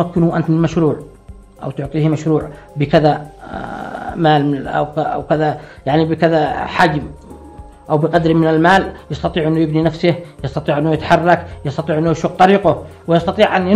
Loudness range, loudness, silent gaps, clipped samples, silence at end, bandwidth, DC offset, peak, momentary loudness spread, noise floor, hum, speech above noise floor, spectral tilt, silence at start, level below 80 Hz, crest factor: 2 LU; -15 LUFS; none; under 0.1%; 0 s; 10 kHz; under 0.1%; 0 dBFS; 13 LU; -36 dBFS; none; 21 dB; -7.5 dB/octave; 0 s; -40 dBFS; 16 dB